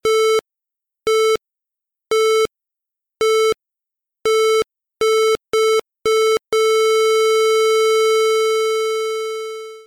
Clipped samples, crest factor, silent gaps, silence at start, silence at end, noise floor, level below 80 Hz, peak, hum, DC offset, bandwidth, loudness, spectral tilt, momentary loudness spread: under 0.1%; 4 dB; none; 0.05 s; 0.05 s; -85 dBFS; -58 dBFS; -14 dBFS; none; under 0.1%; 16.5 kHz; -17 LUFS; -0.5 dB/octave; 9 LU